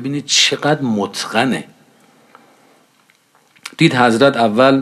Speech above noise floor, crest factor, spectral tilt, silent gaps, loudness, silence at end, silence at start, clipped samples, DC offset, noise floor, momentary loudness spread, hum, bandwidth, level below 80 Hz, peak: 41 dB; 16 dB; -4 dB/octave; none; -14 LUFS; 0 s; 0 s; under 0.1%; under 0.1%; -55 dBFS; 9 LU; none; 14 kHz; -64 dBFS; 0 dBFS